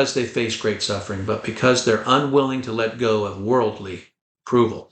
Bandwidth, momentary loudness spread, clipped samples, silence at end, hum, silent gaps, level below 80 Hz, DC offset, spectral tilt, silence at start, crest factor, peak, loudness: 9.2 kHz; 8 LU; under 0.1%; 0.1 s; none; 4.21-4.35 s; -58 dBFS; under 0.1%; -4.5 dB/octave; 0 s; 18 dB; -2 dBFS; -21 LUFS